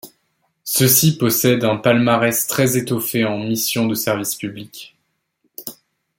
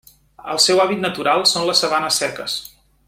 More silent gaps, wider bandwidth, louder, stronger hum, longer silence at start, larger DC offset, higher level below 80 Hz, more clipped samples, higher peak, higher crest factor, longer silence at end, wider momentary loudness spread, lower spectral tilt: neither; about the same, 17 kHz vs 16.5 kHz; about the same, -17 LUFS vs -17 LUFS; neither; second, 0.05 s vs 0.4 s; neither; about the same, -58 dBFS vs -58 dBFS; neither; about the same, 0 dBFS vs -2 dBFS; about the same, 18 dB vs 18 dB; about the same, 0.45 s vs 0.4 s; first, 20 LU vs 12 LU; first, -4 dB/octave vs -2 dB/octave